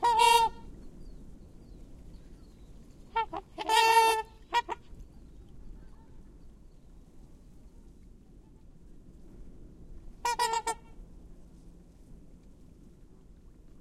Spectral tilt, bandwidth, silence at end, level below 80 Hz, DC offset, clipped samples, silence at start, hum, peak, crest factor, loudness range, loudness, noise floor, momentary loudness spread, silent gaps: -1.5 dB/octave; 16 kHz; 1.45 s; -52 dBFS; under 0.1%; under 0.1%; 0 s; none; -10 dBFS; 24 dB; 12 LU; -28 LUFS; -54 dBFS; 31 LU; none